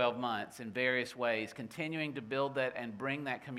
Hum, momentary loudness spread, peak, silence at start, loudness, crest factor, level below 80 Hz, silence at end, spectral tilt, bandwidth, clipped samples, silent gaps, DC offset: none; 7 LU; -16 dBFS; 0 s; -36 LUFS; 20 dB; -78 dBFS; 0 s; -5 dB/octave; 15.5 kHz; under 0.1%; none; under 0.1%